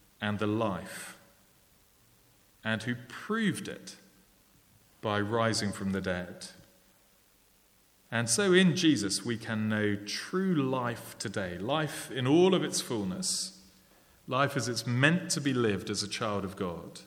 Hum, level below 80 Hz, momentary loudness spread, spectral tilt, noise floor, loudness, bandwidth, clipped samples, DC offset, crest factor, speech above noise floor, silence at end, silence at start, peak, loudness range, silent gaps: none; -68 dBFS; 14 LU; -4.5 dB/octave; -65 dBFS; -30 LUFS; 19 kHz; under 0.1%; under 0.1%; 24 dB; 35 dB; 0 s; 0.2 s; -8 dBFS; 8 LU; none